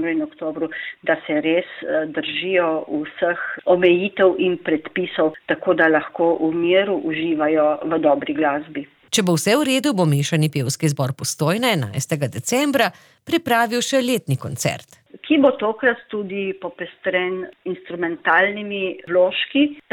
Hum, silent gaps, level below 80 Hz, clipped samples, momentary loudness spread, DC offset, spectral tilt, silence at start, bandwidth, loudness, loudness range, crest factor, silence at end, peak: none; none; -64 dBFS; under 0.1%; 10 LU; under 0.1%; -5 dB/octave; 0 s; 19.5 kHz; -20 LUFS; 3 LU; 16 dB; 0.15 s; -4 dBFS